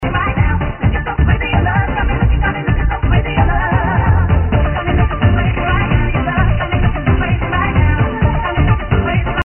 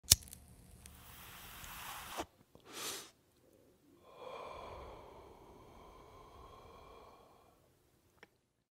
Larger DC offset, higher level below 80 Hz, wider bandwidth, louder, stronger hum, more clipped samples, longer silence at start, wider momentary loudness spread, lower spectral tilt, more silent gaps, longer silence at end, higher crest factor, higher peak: neither; first, -18 dBFS vs -58 dBFS; second, 3.2 kHz vs 16 kHz; first, -15 LUFS vs -40 LUFS; neither; neither; about the same, 0 s vs 0.05 s; second, 3 LU vs 16 LU; first, -4.5 dB/octave vs -1 dB/octave; neither; second, 0 s vs 0.45 s; second, 12 dB vs 42 dB; about the same, -2 dBFS vs -4 dBFS